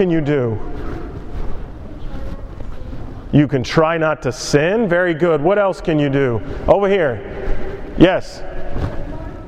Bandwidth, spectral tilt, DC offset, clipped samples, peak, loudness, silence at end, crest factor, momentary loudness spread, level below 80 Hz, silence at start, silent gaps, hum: 11 kHz; -6.5 dB/octave; under 0.1%; under 0.1%; 0 dBFS; -17 LUFS; 0 s; 18 dB; 18 LU; -30 dBFS; 0 s; none; none